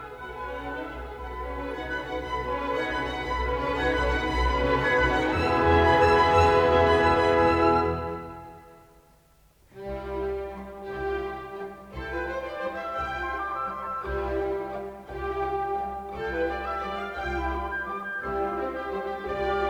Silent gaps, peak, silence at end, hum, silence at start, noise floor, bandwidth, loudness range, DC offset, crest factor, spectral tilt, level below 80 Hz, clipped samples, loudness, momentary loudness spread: none; -8 dBFS; 0 s; none; 0 s; -59 dBFS; 19 kHz; 13 LU; under 0.1%; 18 dB; -6 dB/octave; -38 dBFS; under 0.1%; -26 LUFS; 17 LU